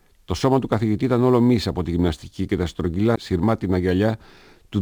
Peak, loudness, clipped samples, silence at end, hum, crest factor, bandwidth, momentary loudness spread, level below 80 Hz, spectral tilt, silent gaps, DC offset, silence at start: -6 dBFS; -21 LUFS; under 0.1%; 0 s; none; 14 dB; over 20 kHz; 8 LU; -40 dBFS; -7.5 dB/octave; none; under 0.1%; 0.3 s